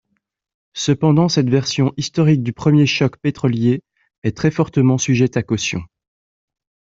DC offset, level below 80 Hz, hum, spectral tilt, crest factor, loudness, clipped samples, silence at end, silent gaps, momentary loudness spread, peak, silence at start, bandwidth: under 0.1%; -52 dBFS; none; -6 dB/octave; 16 dB; -17 LUFS; under 0.1%; 1.1 s; 4.18-4.22 s; 9 LU; -2 dBFS; 0.75 s; 7.8 kHz